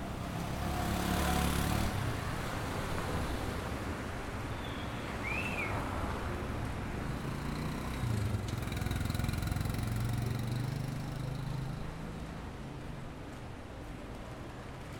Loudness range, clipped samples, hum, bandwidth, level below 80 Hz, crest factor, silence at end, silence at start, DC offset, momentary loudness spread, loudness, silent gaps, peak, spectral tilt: 7 LU; under 0.1%; none; over 20 kHz; -44 dBFS; 18 dB; 0 s; 0 s; under 0.1%; 12 LU; -37 LUFS; none; -18 dBFS; -5.5 dB/octave